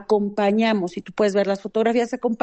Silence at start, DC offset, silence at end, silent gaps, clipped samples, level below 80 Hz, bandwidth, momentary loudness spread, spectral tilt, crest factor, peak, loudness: 0 s; under 0.1%; 0.05 s; none; under 0.1%; -62 dBFS; 8.6 kHz; 5 LU; -6 dB/octave; 14 dB; -8 dBFS; -21 LUFS